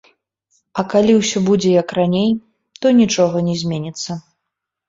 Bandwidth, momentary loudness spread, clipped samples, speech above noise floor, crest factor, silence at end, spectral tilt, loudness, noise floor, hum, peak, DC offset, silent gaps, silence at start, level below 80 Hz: 7.8 kHz; 12 LU; under 0.1%; 64 dB; 16 dB; 0.7 s; -5.5 dB/octave; -16 LUFS; -79 dBFS; none; -2 dBFS; under 0.1%; none; 0.75 s; -54 dBFS